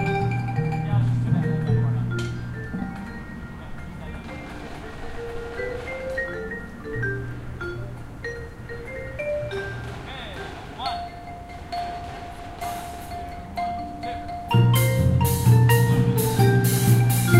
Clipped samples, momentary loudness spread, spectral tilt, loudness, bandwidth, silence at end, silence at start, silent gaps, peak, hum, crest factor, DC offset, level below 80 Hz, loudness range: under 0.1%; 18 LU; -6 dB/octave; -24 LUFS; 16 kHz; 0 s; 0 s; none; -4 dBFS; none; 20 dB; under 0.1%; -40 dBFS; 13 LU